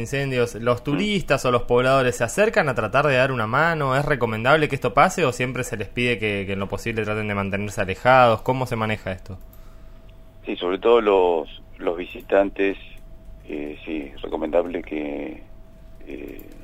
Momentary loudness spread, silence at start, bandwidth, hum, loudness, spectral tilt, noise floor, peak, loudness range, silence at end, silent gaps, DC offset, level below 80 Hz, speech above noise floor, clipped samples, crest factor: 15 LU; 0 s; 16 kHz; none; -21 LUFS; -5.5 dB/octave; -43 dBFS; -2 dBFS; 7 LU; 0 s; none; under 0.1%; -42 dBFS; 22 dB; under 0.1%; 20 dB